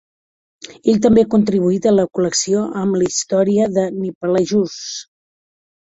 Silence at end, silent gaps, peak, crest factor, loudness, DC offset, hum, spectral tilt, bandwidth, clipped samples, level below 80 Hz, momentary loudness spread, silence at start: 0.9 s; 4.15-4.21 s; -2 dBFS; 16 dB; -16 LUFS; under 0.1%; none; -5 dB/octave; 8.4 kHz; under 0.1%; -52 dBFS; 10 LU; 0.7 s